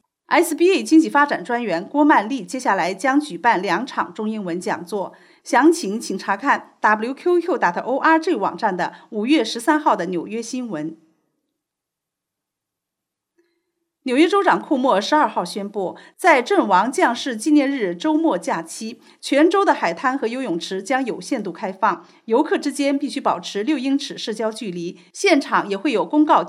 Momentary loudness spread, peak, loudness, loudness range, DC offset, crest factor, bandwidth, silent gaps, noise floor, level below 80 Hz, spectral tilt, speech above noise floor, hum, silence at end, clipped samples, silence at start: 11 LU; -2 dBFS; -19 LUFS; 5 LU; under 0.1%; 16 dB; 15 kHz; none; -83 dBFS; -82 dBFS; -4 dB/octave; 64 dB; none; 0 s; under 0.1%; 0.3 s